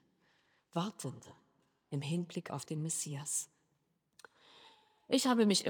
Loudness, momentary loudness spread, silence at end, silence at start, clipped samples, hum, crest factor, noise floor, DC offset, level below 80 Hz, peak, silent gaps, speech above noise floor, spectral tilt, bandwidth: -36 LUFS; 15 LU; 0 s; 0.75 s; under 0.1%; none; 22 dB; -79 dBFS; under 0.1%; -88 dBFS; -16 dBFS; none; 44 dB; -4 dB/octave; over 20 kHz